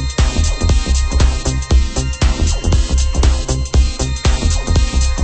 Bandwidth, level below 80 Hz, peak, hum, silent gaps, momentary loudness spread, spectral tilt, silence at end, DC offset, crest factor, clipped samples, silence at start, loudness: 8.8 kHz; -14 dBFS; 0 dBFS; none; none; 2 LU; -4.5 dB/octave; 0 s; under 0.1%; 12 dB; under 0.1%; 0 s; -16 LUFS